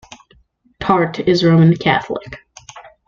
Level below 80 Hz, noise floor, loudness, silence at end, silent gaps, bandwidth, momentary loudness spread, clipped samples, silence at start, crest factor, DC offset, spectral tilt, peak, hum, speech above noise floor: -48 dBFS; -54 dBFS; -15 LUFS; 0.3 s; none; 7.2 kHz; 17 LU; under 0.1%; 0.8 s; 14 dB; under 0.1%; -7 dB/octave; -2 dBFS; none; 40 dB